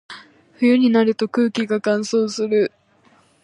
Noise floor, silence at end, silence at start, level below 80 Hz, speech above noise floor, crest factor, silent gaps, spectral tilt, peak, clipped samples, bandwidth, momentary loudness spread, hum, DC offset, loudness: -56 dBFS; 0.75 s; 0.1 s; -72 dBFS; 38 dB; 14 dB; none; -5 dB/octave; -4 dBFS; under 0.1%; 10.5 kHz; 8 LU; none; under 0.1%; -19 LUFS